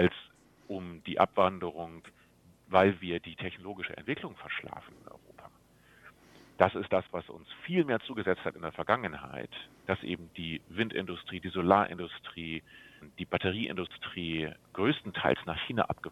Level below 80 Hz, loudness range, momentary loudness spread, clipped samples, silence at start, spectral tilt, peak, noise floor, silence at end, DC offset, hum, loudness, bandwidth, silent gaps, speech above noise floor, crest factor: -66 dBFS; 4 LU; 17 LU; under 0.1%; 0 s; -7 dB/octave; -6 dBFS; -62 dBFS; 0 s; under 0.1%; none; -32 LUFS; 13.5 kHz; none; 29 dB; 28 dB